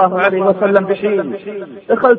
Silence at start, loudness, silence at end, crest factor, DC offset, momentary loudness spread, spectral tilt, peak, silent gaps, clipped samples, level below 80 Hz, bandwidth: 0 s; -15 LUFS; 0 s; 14 dB; under 0.1%; 13 LU; -9 dB/octave; 0 dBFS; none; under 0.1%; -58 dBFS; 4.7 kHz